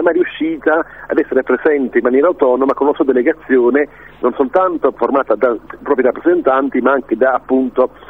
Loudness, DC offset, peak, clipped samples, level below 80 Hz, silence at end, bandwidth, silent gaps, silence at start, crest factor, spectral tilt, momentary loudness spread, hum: -14 LUFS; 0.3%; 0 dBFS; under 0.1%; -50 dBFS; 0.25 s; 3.9 kHz; none; 0 s; 14 dB; -8 dB/octave; 5 LU; none